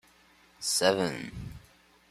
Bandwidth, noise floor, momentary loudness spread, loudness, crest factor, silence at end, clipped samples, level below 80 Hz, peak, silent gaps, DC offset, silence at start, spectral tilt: 14.5 kHz; -61 dBFS; 18 LU; -28 LUFS; 24 dB; 0.55 s; under 0.1%; -56 dBFS; -8 dBFS; none; under 0.1%; 0.6 s; -3 dB/octave